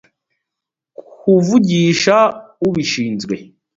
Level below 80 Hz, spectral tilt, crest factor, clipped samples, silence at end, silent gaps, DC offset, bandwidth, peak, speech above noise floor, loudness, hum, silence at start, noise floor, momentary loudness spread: -56 dBFS; -5.5 dB/octave; 16 dB; under 0.1%; 0.35 s; none; under 0.1%; 7.8 kHz; 0 dBFS; 69 dB; -15 LUFS; none; 1.25 s; -83 dBFS; 11 LU